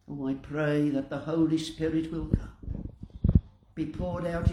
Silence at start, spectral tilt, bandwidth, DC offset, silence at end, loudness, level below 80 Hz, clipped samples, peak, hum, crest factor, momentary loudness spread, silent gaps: 0.1 s; -8 dB/octave; 11.5 kHz; under 0.1%; 0 s; -30 LUFS; -38 dBFS; under 0.1%; -6 dBFS; none; 22 dB; 13 LU; none